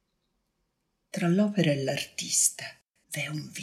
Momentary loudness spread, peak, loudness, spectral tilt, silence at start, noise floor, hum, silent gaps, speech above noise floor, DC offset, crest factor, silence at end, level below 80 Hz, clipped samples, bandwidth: 16 LU; -8 dBFS; -27 LUFS; -3.5 dB/octave; 1.15 s; -78 dBFS; none; none; 50 dB; under 0.1%; 22 dB; 0 s; -74 dBFS; under 0.1%; 15 kHz